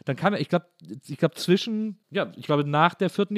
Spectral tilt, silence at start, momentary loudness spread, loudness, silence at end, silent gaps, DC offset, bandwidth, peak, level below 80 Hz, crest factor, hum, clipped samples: -6.5 dB/octave; 0.05 s; 10 LU; -25 LUFS; 0 s; none; under 0.1%; 15 kHz; -6 dBFS; -80 dBFS; 20 dB; none; under 0.1%